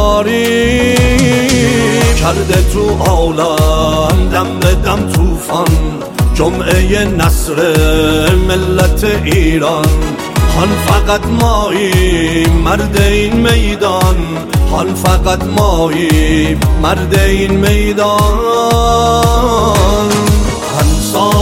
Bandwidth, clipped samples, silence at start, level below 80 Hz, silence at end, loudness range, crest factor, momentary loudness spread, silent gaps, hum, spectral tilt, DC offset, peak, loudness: 17 kHz; under 0.1%; 0 s; -16 dBFS; 0 s; 2 LU; 10 dB; 3 LU; none; none; -5 dB/octave; under 0.1%; 0 dBFS; -11 LUFS